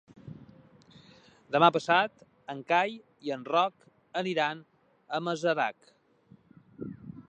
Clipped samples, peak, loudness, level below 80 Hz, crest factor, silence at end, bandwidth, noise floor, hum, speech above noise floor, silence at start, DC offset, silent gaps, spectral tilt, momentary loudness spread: under 0.1%; -8 dBFS; -29 LUFS; -74 dBFS; 24 dB; 0.1 s; 9.2 kHz; -61 dBFS; none; 32 dB; 0.25 s; under 0.1%; none; -5 dB/octave; 22 LU